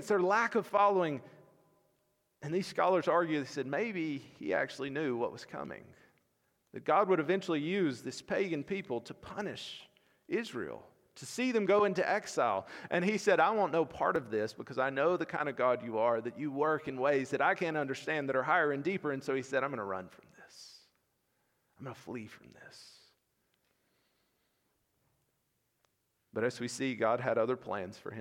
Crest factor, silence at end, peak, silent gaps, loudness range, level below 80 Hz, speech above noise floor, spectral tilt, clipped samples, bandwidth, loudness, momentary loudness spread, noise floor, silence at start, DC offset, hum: 20 dB; 0 s; -14 dBFS; none; 16 LU; -76 dBFS; 47 dB; -5.5 dB/octave; under 0.1%; 15.5 kHz; -33 LUFS; 16 LU; -80 dBFS; 0 s; under 0.1%; none